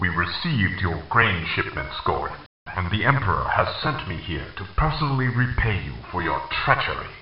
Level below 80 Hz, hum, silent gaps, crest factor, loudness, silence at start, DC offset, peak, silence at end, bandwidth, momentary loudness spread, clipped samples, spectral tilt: -36 dBFS; none; 2.46-2.66 s; 24 dB; -24 LUFS; 0 s; 0.5%; 0 dBFS; 0 s; 5.6 kHz; 10 LU; under 0.1%; -3.5 dB/octave